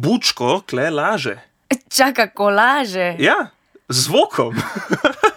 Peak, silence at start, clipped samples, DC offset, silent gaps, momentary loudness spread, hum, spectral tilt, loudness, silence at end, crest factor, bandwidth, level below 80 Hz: 0 dBFS; 0 s; under 0.1%; under 0.1%; none; 9 LU; none; -3.5 dB/octave; -17 LUFS; 0 s; 16 dB; over 20 kHz; -60 dBFS